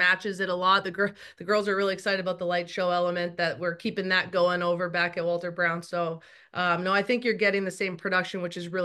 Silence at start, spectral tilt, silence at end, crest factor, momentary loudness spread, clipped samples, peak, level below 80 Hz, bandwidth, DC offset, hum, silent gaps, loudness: 0 s; -5 dB/octave; 0 s; 18 dB; 7 LU; under 0.1%; -8 dBFS; -74 dBFS; 12.5 kHz; under 0.1%; none; none; -27 LUFS